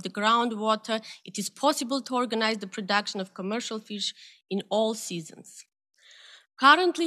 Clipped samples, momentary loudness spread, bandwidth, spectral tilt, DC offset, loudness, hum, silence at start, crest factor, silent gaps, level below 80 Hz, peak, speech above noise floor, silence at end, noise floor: under 0.1%; 13 LU; 14.5 kHz; -3 dB/octave; under 0.1%; -26 LUFS; none; 0 s; 24 dB; none; under -90 dBFS; -2 dBFS; 26 dB; 0 s; -53 dBFS